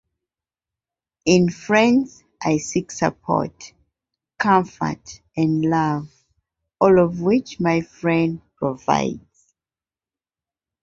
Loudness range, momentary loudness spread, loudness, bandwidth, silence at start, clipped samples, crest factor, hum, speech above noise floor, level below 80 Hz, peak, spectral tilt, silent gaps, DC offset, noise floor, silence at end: 3 LU; 11 LU; -20 LUFS; 7.8 kHz; 1.25 s; under 0.1%; 20 dB; none; over 71 dB; -54 dBFS; -2 dBFS; -6 dB/octave; none; under 0.1%; under -90 dBFS; 1.65 s